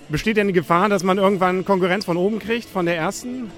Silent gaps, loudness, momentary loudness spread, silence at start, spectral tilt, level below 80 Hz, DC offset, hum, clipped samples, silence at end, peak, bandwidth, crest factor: none; -20 LUFS; 7 LU; 0 s; -5.5 dB/octave; -48 dBFS; under 0.1%; none; under 0.1%; 0 s; -4 dBFS; 16.5 kHz; 16 dB